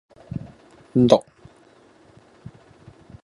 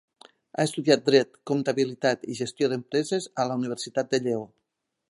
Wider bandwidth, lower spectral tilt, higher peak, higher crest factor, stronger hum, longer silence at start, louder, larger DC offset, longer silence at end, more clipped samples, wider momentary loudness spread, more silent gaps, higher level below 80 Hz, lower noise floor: about the same, 11 kHz vs 11.5 kHz; first, -7.5 dB/octave vs -5 dB/octave; first, 0 dBFS vs -4 dBFS; about the same, 24 dB vs 22 dB; neither; second, 0.35 s vs 0.6 s; first, -19 LUFS vs -26 LUFS; neither; first, 2.05 s vs 0.65 s; neither; first, 19 LU vs 8 LU; neither; first, -54 dBFS vs -74 dBFS; second, -53 dBFS vs -81 dBFS